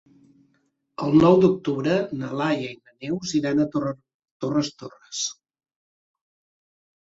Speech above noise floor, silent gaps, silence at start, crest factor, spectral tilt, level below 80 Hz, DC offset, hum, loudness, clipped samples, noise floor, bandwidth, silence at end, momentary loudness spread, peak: 47 dB; 4.14-4.20 s, 4.31-4.40 s; 1 s; 20 dB; -5.5 dB/octave; -58 dBFS; under 0.1%; none; -23 LUFS; under 0.1%; -69 dBFS; 8 kHz; 1.7 s; 18 LU; -4 dBFS